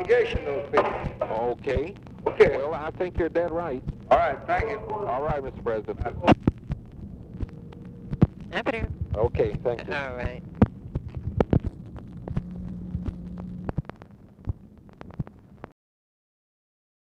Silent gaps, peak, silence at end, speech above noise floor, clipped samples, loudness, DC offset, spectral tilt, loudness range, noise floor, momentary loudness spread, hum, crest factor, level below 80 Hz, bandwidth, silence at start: none; -8 dBFS; 1.35 s; 23 dB; under 0.1%; -27 LUFS; under 0.1%; -8.5 dB/octave; 12 LU; -49 dBFS; 18 LU; none; 20 dB; -40 dBFS; 9.2 kHz; 0 s